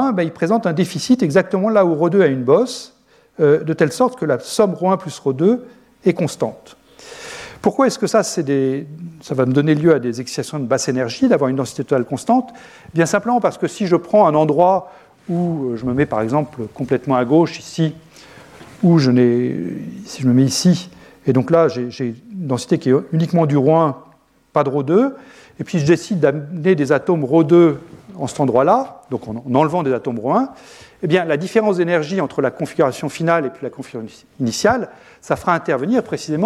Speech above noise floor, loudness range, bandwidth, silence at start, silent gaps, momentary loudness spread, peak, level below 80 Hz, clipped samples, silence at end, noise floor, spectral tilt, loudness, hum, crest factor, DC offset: 26 dB; 4 LU; 14 kHz; 0 s; none; 12 LU; -2 dBFS; -56 dBFS; under 0.1%; 0 s; -42 dBFS; -6.5 dB/octave; -17 LUFS; none; 16 dB; under 0.1%